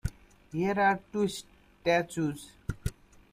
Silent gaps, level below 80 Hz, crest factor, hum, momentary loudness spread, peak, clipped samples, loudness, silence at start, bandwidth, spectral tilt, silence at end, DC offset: none; -48 dBFS; 20 dB; none; 14 LU; -12 dBFS; under 0.1%; -31 LUFS; 0.05 s; 15.5 kHz; -5.5 dB/octave; 0.4 s; under 0.1%